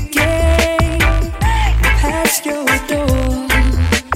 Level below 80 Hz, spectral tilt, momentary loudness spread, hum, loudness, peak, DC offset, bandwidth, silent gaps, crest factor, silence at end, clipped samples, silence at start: -18 dBFS; -4.5 dB/octave; 3 LU; none; -15 LUFS; 0 dBFS; under 0.1%; 16.5 kHz; none; 14 dB; 0 s; under 0.1%; 0 s